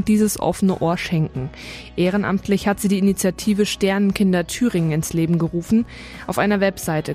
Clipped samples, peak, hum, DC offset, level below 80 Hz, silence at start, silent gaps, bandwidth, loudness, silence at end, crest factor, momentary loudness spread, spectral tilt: under 0.1%; -4 dBFS; none; under 0.1%; -44 dBFS; 0 s; none; 15.5 kHz; -20 LUFS; 0 s; 16 dB; 8 LU; -5.5 dB/octave